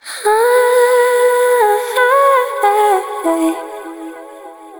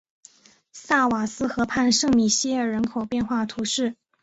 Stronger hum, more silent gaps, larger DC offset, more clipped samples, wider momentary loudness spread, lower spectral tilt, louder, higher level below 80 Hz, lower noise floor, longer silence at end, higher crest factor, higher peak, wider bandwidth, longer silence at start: neither; neither; neither; neither; first, 17 LU vs 7 LU; second, -0.5 dB/octave vs -3 dB/octave; first, -13 LUFS vs -23 LUFS; second, -68 dBFS vs -54 dBFS; second, -34 dBFS vs -54 dBFS; second, 0 s vs 0.3 s; about the same, 12 dB vs 16 dB; first, -2 dBFS vs -8 dBFS; first, over 20 kHz vs 8.2 kHz; second, 0.05 s vs 0.75 s